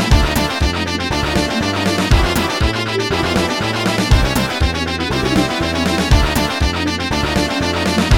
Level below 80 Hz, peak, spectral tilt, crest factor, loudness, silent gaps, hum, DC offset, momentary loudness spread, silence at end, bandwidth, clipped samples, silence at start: -22 dBFS; 0 dBFS; -4.5 dB/octave; 16 dB; -16 LUFS; none; none; under 0.1%; 4 LU; 0 s; 18 kHz; under 0.1%; 0 s